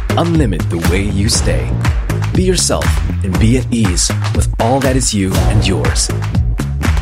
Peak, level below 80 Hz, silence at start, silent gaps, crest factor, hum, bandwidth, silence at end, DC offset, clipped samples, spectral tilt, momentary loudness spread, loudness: 0 dBFS; -18 dBFS; 0 s; none; 12 dB; none; 16 kHz; 0 s; under 0.1%; under 0.1%; -5 dB/octave; 4 LU; -14 LUFS